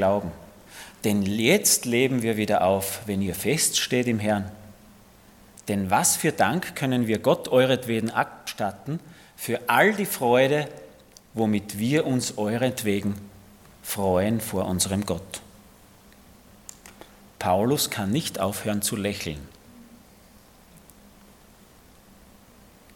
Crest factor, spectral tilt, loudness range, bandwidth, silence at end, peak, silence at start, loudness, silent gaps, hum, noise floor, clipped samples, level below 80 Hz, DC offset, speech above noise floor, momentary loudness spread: 22 dB; -4 dB/octave; 6 LU; 17.5 kHz; 2.15 s; -4 dBFS; 0 s; -24 LUFS; none; none; -53 dBFS; under 0.1%; -58 dBFS; under 0.1%; 29 dB; 17 LU